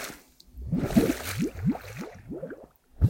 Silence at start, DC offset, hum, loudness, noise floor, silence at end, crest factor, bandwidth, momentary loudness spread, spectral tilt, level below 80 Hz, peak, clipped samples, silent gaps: 0 s; under 0.1%; none; -29 LUFS; -48 dBFS; 0 s; 20 dB; 17 kHz; 18 LU; -6.5 dB/octave; -40 dBFS; -8 dBFS; under 0.1%; none